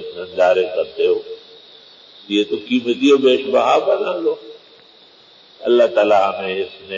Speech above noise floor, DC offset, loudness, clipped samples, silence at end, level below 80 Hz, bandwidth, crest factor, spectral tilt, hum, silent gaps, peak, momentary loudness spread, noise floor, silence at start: 31 dB; under 0.1%; -17 LUFS; under 0.1%; 0 s; -64 dBFS; 7.6 kHz; 14 dB; -4.5 dB/octave; none; none; -4 dBFS; 11 LU; -47 dBFS; 0 s